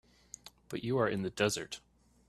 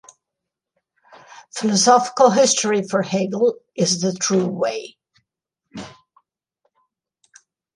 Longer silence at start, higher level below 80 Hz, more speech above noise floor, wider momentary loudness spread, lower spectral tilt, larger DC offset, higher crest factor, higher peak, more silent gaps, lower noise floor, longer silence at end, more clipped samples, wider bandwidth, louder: second, 0.45 s vs 1.35 s; about the same, -66 dBFS vs -68 dBFS; second, 22 dB vs 65 dB; second, 19 LU vs 23 LU; about the same, -4.5 dB/octave vs -3.5 dB/octave; neither; about the same, 22 dB vs 20 dB; second, -14 dBFS vs -2 dBFS; neither; second, -55 dBFS vs -83 dBFS; second, 0.5 s vs 1.85 s; neither; first, 13.5 kHz vs 11.5 kHz; second, -34 LUFS vs -18 LUFS